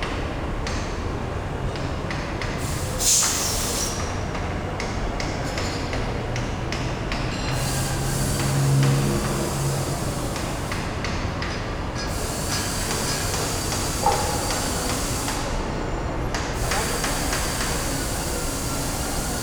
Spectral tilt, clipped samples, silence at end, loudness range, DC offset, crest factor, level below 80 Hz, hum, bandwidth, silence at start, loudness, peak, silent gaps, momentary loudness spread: -3.5 dB/octave; under 0.1%; 0 s; 4 LU; under 0.1%; 18 dB; -32 dBFS; none; over 20 kHz; 0 s; -25 LUFS; -6 dBFS; none; 7 LU